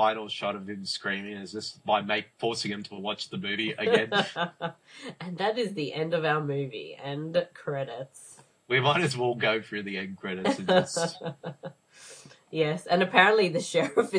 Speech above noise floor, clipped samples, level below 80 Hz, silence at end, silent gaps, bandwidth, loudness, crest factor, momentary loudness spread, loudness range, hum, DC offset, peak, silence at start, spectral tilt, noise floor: 22 dB; under 0.1%; -76 dBFS; 0 s; none; 11 kHz; -28 LUFS; 26 dB; 15 LU; 5 LU; none; under 0.1%; -2 dBFS; 0 s; -4.5 dB/octave; -50 dBFS